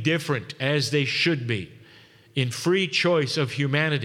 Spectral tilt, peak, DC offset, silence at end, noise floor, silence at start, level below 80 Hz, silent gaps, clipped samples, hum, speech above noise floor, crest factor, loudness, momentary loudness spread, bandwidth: -5 dB/octave; -8 dBFS; under 0.1%; 0 s; -52 dBFS; 0 s; -68 dBFS; none; under 0.1%; none; 28 dB; 16 dB; -24 LUFS; 8 LU; 15.5 kHz